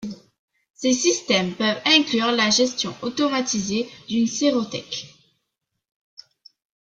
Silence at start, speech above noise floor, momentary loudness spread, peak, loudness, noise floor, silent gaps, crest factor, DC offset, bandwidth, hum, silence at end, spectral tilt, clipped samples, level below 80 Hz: 0 s; 58 dB; 11 LU; -4 dBFS; -21 LUFS; -79 dBFS; 0.39-0.48 s, 0.70-0.74 s; 20 dB; under 0.1%; 9.4 kHz; none; 1.8 s; -2.5 dB/octave; under 0.1%; -62 dBFS